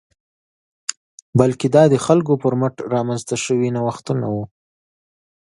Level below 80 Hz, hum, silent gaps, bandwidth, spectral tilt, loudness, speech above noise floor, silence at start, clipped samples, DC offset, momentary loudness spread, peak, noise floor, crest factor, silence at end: -56 dBFS; none; 0.97-1.33 s; 11.5 kHz; -6.5 dB/octave; -19 LUFS; over 73 dB; 0.9 s; under 0.1%; under 0.1%; 15 LU; 0 dBFS; under -90 dBFS; 18 dB; 0.95 s